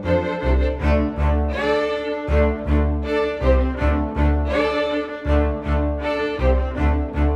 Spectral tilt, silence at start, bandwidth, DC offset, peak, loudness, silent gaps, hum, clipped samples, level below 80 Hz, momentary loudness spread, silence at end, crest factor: -8 dB/octave; 0 s; 6.4 kHz; under 0.1%; -6 dBFS; -21 LUFS; none; none; under 0.1%; -22 dBFS; 3 LU; 0 s; 14 dB